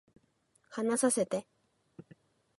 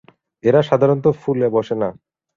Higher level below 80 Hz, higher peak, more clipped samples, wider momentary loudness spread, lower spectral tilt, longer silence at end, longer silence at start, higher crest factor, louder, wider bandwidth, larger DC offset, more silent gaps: second, -80 dBFS vs -56 dBFS; second, -14 dBFS vs -2 dBFS; neither; first, 11 LU vs 8 LU; second, -4 dB/octave vs -8.5 dB/octave; about the same, 0.55 s vs 0.45 s; first, 0.7 s vs 0.45 s; first, 22 dB vs 16 dB; second, -31 LUFS vs -18 LUFS; first, 12 kHz vs 7.2 kHz; neither; neither